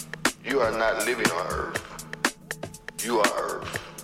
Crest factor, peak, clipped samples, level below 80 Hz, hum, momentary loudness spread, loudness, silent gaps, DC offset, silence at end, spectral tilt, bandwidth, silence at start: 22 dB; -6 dBFS; under 0.1%; -50 dBFS; none; 13 LU; -27 LUFS; none; under 0.1%; 0 s; -3 dB/octave; 16.5 kHz; 0 s